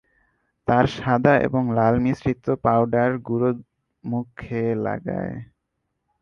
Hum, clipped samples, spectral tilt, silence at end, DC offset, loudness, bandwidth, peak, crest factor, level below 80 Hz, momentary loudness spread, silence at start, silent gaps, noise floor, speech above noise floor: none; under 0.1%; -8.5 dB/octave; 0.75 s; under 0.1%; -22 LUFS; 7 kHz; -2 dBFS; 22 dB; -48 dBFS; 12 LU; 0.65 s; none; -77 dBFS; 56 dB